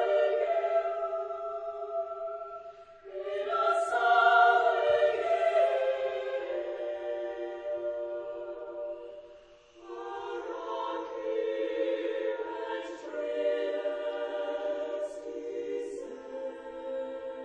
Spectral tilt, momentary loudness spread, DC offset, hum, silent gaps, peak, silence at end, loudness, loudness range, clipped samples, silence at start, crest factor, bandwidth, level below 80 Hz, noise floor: -3 dB/octave; 15 LU; under 0.1%; none; none; -10 dBFS; 0 s; -31 LUFS; 12 LU; under 0.1%; 0 s; 20 dB; 9.8 kHz; -72 dBFS; -55 dBFS